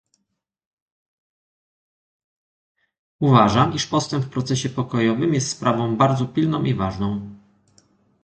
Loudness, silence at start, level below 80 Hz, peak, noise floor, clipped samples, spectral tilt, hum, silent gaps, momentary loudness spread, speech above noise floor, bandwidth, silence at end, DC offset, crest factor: -20 LUFS; 3.2 s; -50 dBFS; 0 dBFS; -77 dBFS; under 0.1%; -6 dB/octave; none; none; 9 LU; 58 dB; 9 kHz; 0.85 s; under 0.1%; 22 dB